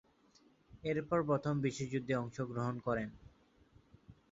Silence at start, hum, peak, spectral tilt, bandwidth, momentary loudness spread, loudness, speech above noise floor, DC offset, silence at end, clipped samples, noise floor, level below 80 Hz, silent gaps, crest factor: 0.75 s; none; -20 dBFS; -6.5 dB/octave; 7.6 kHz; 6 LU; -37 LUFS; 32 dB; under 0.1%; 0.2 s; under 0.1%; -68 dBFS; -66 dBFS; none; 18 dB